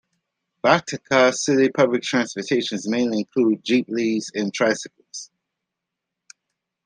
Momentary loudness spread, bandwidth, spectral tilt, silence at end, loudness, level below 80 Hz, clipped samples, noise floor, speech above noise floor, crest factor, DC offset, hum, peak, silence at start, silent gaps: 9 LU; 10 kHz; -4 dB/octave; 1.6 s; -21 LUFS; -68 dBFS; under 0.1%; -83 dBFS; 63 dB; 22 dB; under 0.1%; none; 0 dBFS; 0.65 s; none